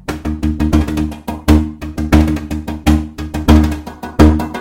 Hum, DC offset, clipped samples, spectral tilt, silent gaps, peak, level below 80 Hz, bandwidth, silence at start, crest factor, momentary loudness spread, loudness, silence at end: none; under 0.1%; 0.3%; -7 dB/octave; none; 0 dBFS; -18 dBFS; 16.5 kHz; 0.1 s; 14 dB; 12 LU; -15 LUFS; 0 s